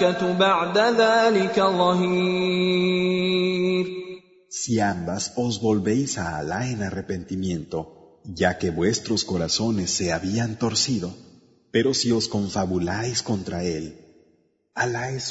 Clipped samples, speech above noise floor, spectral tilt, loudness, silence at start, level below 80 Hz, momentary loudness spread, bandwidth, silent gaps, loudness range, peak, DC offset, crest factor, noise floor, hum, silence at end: under 0.1%; 41 dB; -4.5 dB/octave; -23 LUFS; 0 s; -54 dBFS; 11 LU; 8 kHz; none; 6 LU; -4 dBFS; under 0.1%; 20 dB; -64 dBFS; none; 0 s